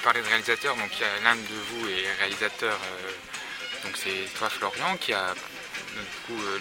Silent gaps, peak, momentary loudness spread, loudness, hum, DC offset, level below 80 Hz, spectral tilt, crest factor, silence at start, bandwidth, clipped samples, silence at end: none; -4 dBFS; 12 LU; -28 LUFS; none; under 0.1%; -66 dBFS; -1.5 dB/octave; 26 dB; 0 s; 16.5 kHz; under 0.1%; 0 s